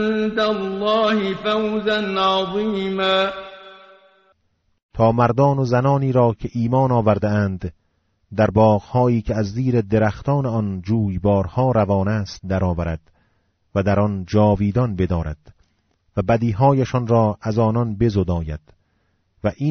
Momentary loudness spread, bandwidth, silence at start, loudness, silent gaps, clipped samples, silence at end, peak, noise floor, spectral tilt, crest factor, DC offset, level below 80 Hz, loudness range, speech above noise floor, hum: 9 LU; 6.6 kHz; 0 s; -19 LUFS; 4.83-4.89 s; under 0.1%; 0 s; -4 dBFS; -66 dBFS; -6 dB/octave; 16 dB; under 0.1%; -40 dBFS; 3 LU; 48 dB; none